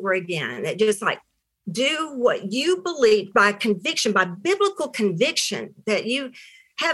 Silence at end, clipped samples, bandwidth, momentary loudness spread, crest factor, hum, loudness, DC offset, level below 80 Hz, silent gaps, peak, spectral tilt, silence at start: 0 s; under 0.1%; 12.5 kHz; 9 LU; 18 dB; none; -22 LUFS; under 0.1%; -72 dBFS; none; -4 dBFS; -3.5 dB/octave; 0 s